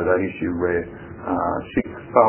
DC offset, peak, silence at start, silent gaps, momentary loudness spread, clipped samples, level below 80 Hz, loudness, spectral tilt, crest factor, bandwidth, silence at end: under 0.1%; 0 dBFS; 0 s; none; 7 LU; under 0.1%; -44 dBFS; -24 LUFS; -11 dB/octave; 20 dB; 3.2 kHz; 0 s